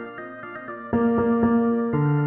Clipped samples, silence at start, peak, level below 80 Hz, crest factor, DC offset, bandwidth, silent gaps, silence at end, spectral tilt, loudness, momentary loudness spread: under 0.1%; 0 s; -8 dBFS; -52 dBFS; 14 dB; under 0.1%; 3.3 kHz; none; 0 s; -12.5 dB/octave; -22 LUFS; 16 LU